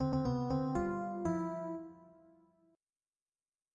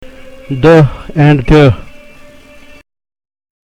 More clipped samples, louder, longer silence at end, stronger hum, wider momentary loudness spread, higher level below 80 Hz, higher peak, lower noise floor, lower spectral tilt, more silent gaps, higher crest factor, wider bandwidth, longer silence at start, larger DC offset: second, under 0.1% vs 0.2%; second, -37 LUFS vs -8 LUFS; second, 1.6 s vs 1.8 s; neither; about the same, 10 LU vs 11 LU; second, -58 dBFS vs -26 dBFS; second, -22 dBFS vs 0 dBFS; first, under -90 dBFS vs -36 dBFS; about the same, -8.5 dB/octave vs -8 dB/octave; neither; about the same, 16 dB vs 12 dB; about the same, 9 kHz vs 8.6 kHz; about the same, 0 s vs 0 s; neither